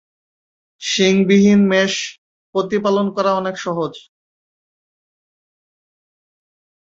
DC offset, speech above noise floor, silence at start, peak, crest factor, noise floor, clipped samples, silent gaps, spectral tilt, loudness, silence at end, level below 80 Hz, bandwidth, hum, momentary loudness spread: under 0.1%; over 74 dB; 0.8 s; -2 dBFS; 18 dB; under -90 dBFS; under 0.1%; 2.18-2.53 s; -5 dB/octave; -16 LUFS; 2.85 s; -60 dBFS; 7.8 kHz; none; 12 LU